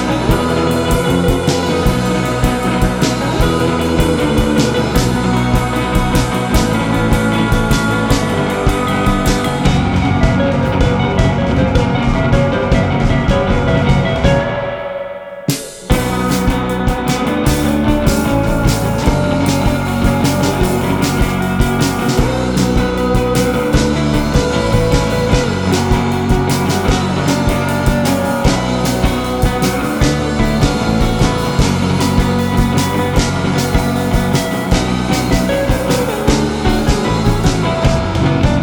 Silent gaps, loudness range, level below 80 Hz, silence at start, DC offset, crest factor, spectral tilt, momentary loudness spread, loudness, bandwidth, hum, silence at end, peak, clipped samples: none; 1 LU; -22 dBFS; 0 s; under 0.1%; 14 dB; -5.5 dB/octave; 2 LU; -14 LUFS; over 20 kHz; none; 0 s; 0 dBFS; under 0.1%